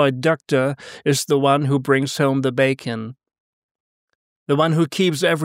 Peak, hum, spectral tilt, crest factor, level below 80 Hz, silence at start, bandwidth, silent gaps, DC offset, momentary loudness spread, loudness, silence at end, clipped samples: -4 dBFS; none; -5.5 dB/octave; 16 dB; -68 dBFS; 0 s; 16 kHz; 3.40-4.08 s, 4.15-4.46 s; under 0.1%; 8 LU; -19 LUFS; 0 s; under 0.1%